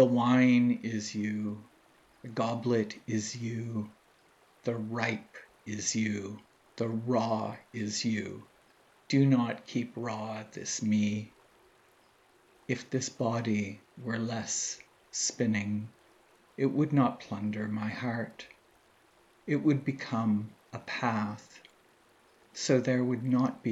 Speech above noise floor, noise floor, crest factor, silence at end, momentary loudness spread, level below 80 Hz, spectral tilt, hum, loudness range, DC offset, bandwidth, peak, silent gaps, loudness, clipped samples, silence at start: 33 dB; -64 dBFS; 22 dB; 0 s; 16 LU; -80 dBFS; -5 dB/octave; none; 4 LU; under 0.1%; 8.2 kHz; -10 dBFS; none; -31 LUFS; under 0.1%; 0 s